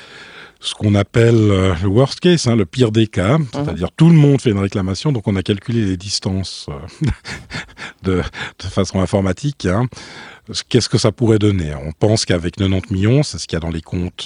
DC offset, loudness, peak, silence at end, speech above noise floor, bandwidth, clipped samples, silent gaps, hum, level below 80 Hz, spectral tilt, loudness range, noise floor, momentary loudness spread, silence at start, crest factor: under 0.1%; -17 LUFS; 0 dBFS; 0 s; 22 dB; 10.5 kHz; under 0.1%; none; none; -40 dBFS; -6 dB/octave; 7 LU; -38 dBFS; 14 LU; 0 s; 16 dB